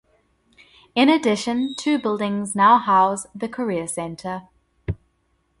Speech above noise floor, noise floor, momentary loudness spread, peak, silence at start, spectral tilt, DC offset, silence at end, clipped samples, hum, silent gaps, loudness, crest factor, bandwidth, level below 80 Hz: 47 dB; -67 dBFS; 17 LU; -4 dBFS; 0.95 s; -4.5 dB/octave; under 0.1%; 0.65 s; under 0.1%; none; none; -20 LUFS; 18 dB; 11.5 kHz; -48 dBFS